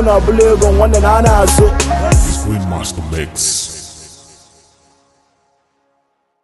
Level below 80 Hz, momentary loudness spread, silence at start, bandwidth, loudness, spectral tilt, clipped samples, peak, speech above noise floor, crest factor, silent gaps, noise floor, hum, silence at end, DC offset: -18 dBFS; 12 LU; 0 s; 12.5 kHz; -12 LUFS; -5 dB/octave; under 0.1%; 0 dBFS; 53 dB; 14 dB; none; -64 dBFS; none; 2.35 s; under 0.1%